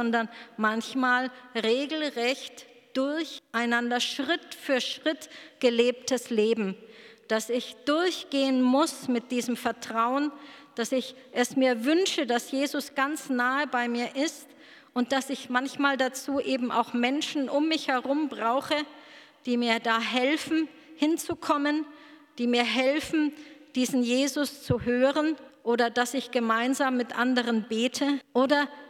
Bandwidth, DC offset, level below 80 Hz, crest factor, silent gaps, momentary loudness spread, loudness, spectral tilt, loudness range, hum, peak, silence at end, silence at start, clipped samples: 16 kHz; under 0.1%; -68 dBFS; 20 dB; none; 7 LU; -27 LUFS; -3.5 dB/octave; 2 LU; none; -8 dBFS; 0 s; 0 s; under 0.1%